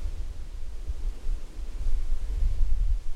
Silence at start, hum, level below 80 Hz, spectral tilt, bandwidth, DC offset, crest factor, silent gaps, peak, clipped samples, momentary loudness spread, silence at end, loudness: 0 s; none; -26 dBFS; -6 dB/octave; 6 kHz; under 0.1%; 14 dB; none; -10 dBFS; under 0.1%; 10 LU; 0 s; -35 LUFS